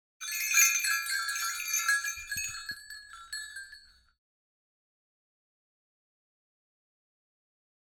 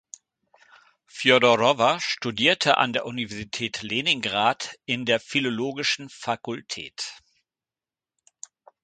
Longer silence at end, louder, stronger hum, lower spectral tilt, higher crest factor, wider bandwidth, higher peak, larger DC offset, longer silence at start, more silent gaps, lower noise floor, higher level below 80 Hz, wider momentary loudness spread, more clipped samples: first, 4.2 s vs 1.7 s; second, -28 LUFS vs -23 LUFS; neither; second, 4 dB/octave vs -3 dB/octave; about the same, 26 dB vs 24 dB; first, 17.5 kHz vs 9.4 kHz; second, -8 dBFS vs -2 dBFS; neither; second, 0.2 s vs 1.15 s; neither; second, -55 dBFS vs under -90 dBFS; about the same, -68 dBFS vs -64 dBFS; first, 21 LU vs 14 LU; neither